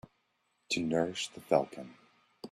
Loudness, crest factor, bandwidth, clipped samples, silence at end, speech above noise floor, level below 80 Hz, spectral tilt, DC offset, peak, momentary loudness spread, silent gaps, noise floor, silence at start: -33 LUFS; 24 dB; 14 kHz; under 0.1%; 0.05 s; 45 dB; -72 dBFS; -4 dB/octave; under 0.1%; -12 dBFS; 19 LU; none; -77 dBFS; 0.7 s